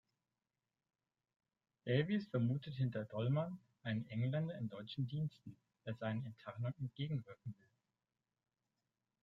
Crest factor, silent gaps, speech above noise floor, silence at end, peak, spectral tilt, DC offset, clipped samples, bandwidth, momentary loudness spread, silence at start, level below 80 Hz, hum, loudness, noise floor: 20 dB; none; over 49 dB; 1.7 s; -22 dBFS; -9.5 dB/octave; under 0.1%; under 0.1%; 5.6 kHz; 15 LU; 1.85 s; -78 dBFS; none; -42 LUFS; under -90 dBFS